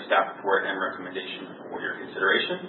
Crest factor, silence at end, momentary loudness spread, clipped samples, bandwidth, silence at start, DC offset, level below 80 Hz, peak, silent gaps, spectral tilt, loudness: 20 dB; 0 s; 13 LU; under 0.1%; 4.3 kHz; 0 s; under 0.1%; -78 dBFS; -8 dBFS; none; -8 dB/octave; -27 LUFS